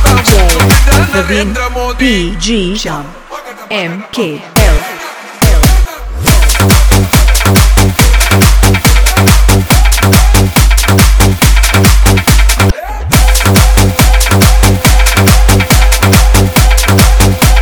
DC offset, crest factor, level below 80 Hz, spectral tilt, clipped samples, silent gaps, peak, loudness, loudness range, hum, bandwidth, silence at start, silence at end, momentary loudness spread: under 0.1%; 6 dB; -10 dBFS; -4 dB/octave; 2%; none; 0 dBFS; -8 LUFS; 6 LU; none; over 20 kHz; 0 s; 0 s; 9 LU